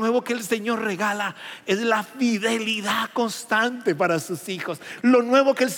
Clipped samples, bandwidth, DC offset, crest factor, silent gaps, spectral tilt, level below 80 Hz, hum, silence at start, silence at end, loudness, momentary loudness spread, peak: under 0.1%; 17 kHz; under 0.1%; 18 dB; none; -4 dB/octave; -84 dBFS; none; 0 s; 0 s; -23 LUFS; 11 LU; -6 dBFS